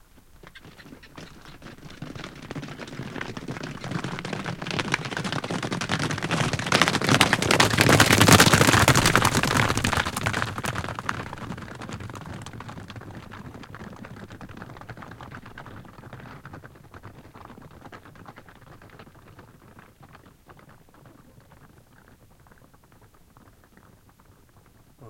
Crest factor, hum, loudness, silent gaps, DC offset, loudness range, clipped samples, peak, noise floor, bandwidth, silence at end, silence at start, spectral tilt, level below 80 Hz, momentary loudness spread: 26 dB; none; -21 LUFS; none; under 0.1%; 25 LU; under 0.1%; 0 dBFS; -55 dBFS; 17 kHz; 0 s; 0.45 s; -3.5 dB/octave; -48 dBFS; 28 LU